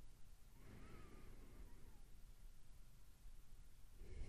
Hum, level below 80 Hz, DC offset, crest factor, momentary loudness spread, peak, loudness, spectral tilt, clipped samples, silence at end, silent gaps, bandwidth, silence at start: none; -60 dBFS; under 0.1%; 18 dB; 7 LU; -40 dBFS; -66 LUFS; -5.5 dB/octave; under 0.1%; 0 s; none; 15 kHz; 0 s